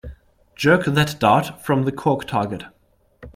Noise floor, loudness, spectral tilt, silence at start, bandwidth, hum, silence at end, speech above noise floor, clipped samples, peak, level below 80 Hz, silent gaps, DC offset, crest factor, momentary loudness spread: -47 dBFS; -19 LUFS; -6 dB/octave; 0.05 s; 16 kHz; none; 0.05 s; 28 dB; under 0.1%; -2 dBFS; -48 dBFS; none; under 0.1%; 20 dB; 7 LU